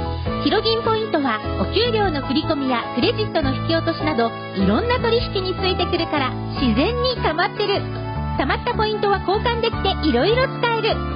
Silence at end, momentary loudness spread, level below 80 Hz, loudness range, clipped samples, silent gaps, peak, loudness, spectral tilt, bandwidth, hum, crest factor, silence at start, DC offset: 0 s; 4 LU; -32 dBFS; 1 LU; under 0.1%; none; -6 dBFS; -20 LUFS; -10.5 dB/octave; 5.4 kHz; none; 14 dB; 0 s; under 0.1%